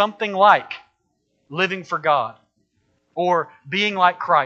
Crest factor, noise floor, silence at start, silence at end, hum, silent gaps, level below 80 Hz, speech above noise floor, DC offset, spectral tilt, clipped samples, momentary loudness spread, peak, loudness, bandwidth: 20 dB; -70 dBFS; 0 s; 0 s; none; none; -72 dBFS; 51 dB; under 0.1%; -5 dB/octave; under 0.1%; 17 LU; 0 dBFS; -19 LUFS; 7.8 kHz